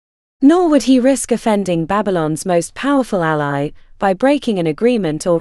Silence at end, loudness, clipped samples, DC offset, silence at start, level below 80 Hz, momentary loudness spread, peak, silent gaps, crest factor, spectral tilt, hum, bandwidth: 0 s; -15 LUFS; under 0.1%; under 0.1%; 0.4 s; -44 dBFS; 6 LU; 0 dBFS; none; 14 dB; -5.5 dB/octave; none; 12.5 kHz